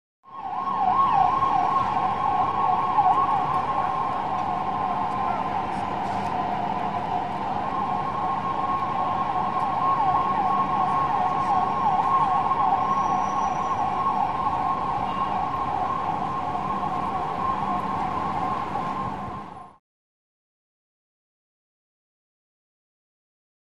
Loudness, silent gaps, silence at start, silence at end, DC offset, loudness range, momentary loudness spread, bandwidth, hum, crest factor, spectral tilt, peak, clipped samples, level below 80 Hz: -24 LUFS; none; 0.25 s; 3.85 s; 0.9%; 6 LU; 6 LU; 10.5 kHz; none; 16 dB; -6 dB/octave; -8 dBFS; under 0.1%; -52 dBFS